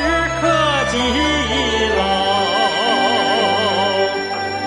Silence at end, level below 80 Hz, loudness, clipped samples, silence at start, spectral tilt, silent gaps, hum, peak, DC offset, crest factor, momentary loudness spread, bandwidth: 0 s; -36 dBFS; -16 LUFS; under 0.1%; 0 s; -3.5 dB/octave; none; none; -4 dBFS; under 0.1%; 14 dB; 2 LU; 11.5 kHz